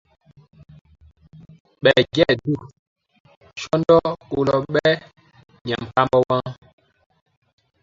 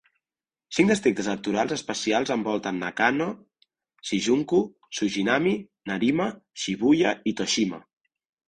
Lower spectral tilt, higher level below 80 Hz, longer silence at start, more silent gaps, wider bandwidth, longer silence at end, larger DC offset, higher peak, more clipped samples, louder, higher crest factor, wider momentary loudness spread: first, -6 dB/octave vs -4.5 dB/octave; first, -52 dBFS vs -62 dBFS; first, 1.85 s vs 0.7 s; first, 2.79-2.96 s, 3.20-3.25 s, 3.37-3.41 s, 5.61-5.65 s vs none; second, 7.6 kHz vs 10.5 kHz; first, 1.3 s vs 0.7 s; neither; first, 0 dBFS vs -6 dBFS; neither; first, -19 LUFS vs -25 LUFS; about the same, 22 dB vs 20 dB; about the same, 12 LU vs 10 LU